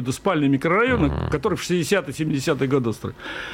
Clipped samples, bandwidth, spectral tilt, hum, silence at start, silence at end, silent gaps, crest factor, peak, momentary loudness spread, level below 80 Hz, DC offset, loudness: under 0.1%; 16.5 kHz; -5.5 dB/octave; none; 0 s; 0 s; none; 14 dB; -8 dBFS; 8 LU; -40 dBFS; under 0.1%; -22 LUFS